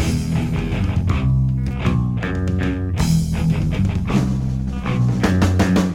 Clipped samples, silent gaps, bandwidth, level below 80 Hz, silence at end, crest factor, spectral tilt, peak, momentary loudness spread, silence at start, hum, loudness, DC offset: under 0.1%; none; 16 kHz; -28 dBFS; 0 s; 14 dB; -7 dB/octave; -4 dBFS; 5 LU; 0 s; none; -19 LUFS; under 0.1%